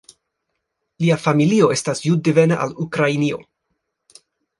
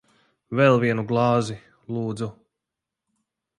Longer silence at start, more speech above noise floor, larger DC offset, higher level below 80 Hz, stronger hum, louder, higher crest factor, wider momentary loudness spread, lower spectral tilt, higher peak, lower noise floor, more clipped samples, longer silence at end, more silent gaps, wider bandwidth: first, 1 s vs 0.5 s; second, 59 dB vs 64 dB; neither; about the same, -62 dBFS vs -62 dBFS; neither; first, -18 LUFS vs -23 LUFS; about the same, 18 dB vs 20 dB; second, 7 LU vs 15 LU; about the same, -6 dB/octave vs -7 dB/octave; about the same, -2 dBFS vs -4 dBFS; second, -76 dBFS vs -86 dBFS; neither; about the same, 1.2 s vs 1.25 s; neither; about the same, 11.5 kHz vs 11 kHz